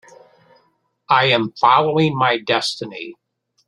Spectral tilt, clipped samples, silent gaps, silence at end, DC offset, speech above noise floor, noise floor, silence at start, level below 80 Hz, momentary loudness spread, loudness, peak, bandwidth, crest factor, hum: -5 dB/octave; under 0.1%; none; 0.55 s; under 0.1%; 46 dB; -63 dBFS; 1.1 s; -64 dBFS; 16 LU; -17 LUFS; 0 dBFS; 13 kHz; 18 dB; none